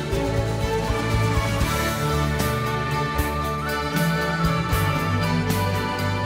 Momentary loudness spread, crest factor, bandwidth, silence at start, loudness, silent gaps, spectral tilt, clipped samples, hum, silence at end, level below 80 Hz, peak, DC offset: 2 LU; 12 dB; 16 kHz; 0 s; -23 LUFS; none; -5.5 dB/octave; under 0.1%; none; 0 s; -32 dBFS; -10 dBFS; under 0.1%